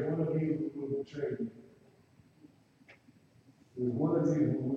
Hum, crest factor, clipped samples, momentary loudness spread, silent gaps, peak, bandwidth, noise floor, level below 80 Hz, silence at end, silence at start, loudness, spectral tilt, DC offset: none; 16 dB; under 0.1%; 10 LU; none; -18 dBFS; 7.2 kHz; -63 dBFS; -72 dBFS; 0 s; 0 s; -33 LUFS; -9.5 dB/octave; under 0.1%